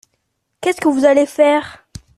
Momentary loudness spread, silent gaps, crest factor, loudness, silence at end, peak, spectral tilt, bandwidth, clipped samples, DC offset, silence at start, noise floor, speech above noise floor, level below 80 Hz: 9 LU; none; 16 dB; -15 LUFS; 0.45 s; 0 dBFS; -4.5 dB/octave; 13 kHz; under 0.1%; under 0.1%; 0.6 s; -70 dBFS; 56 dB; -52 dBFS